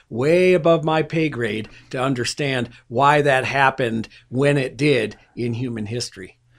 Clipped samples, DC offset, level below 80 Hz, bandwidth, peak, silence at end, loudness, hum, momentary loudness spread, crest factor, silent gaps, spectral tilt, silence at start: under 0.1%; under 0.1%; -52 dBFS; 14.5 kHz; 0 dBFS; 0.3 s; -20 LUFS; none; 13 LU; 20 dB; none; -5.5 dB/octave; 0.1 s